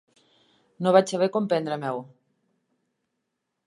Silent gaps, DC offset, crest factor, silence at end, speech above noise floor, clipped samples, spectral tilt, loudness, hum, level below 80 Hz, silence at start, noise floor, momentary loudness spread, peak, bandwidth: none; under 0.1%; 24 dB; 1.65 s; 57 dB; under 0.1%; -6 dB/octave; -24 LUFS; none; -80 dBFS; 0.8 s; -80 dBFS; 11 LU; -4 dBFS; 11.5 kHz